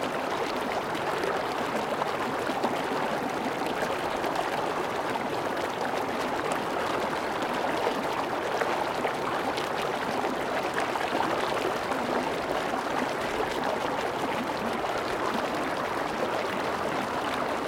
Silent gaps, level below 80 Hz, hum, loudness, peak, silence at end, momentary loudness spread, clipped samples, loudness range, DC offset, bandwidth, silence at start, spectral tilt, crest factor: none; -58 dBFS; none; -29 LUFS; -12 dBFS; 0 s; 2 LU; under 0.1%; 1 LU; under 0.1%; 17 kHz; 0 s; -4 dB/octave; 16 dB